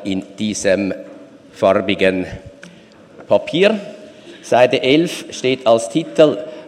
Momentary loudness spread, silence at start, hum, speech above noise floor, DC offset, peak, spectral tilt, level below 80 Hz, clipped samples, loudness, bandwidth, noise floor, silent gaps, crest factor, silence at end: 15 LU; 0 s; none; 27 dB; under 0.1%; 0 dBFS; -4.5 dB/octave; -52 dBFS; under 0.1%; -16 LUFS; 13 kHz; -43 dBFS; none; 18 dB; 0 s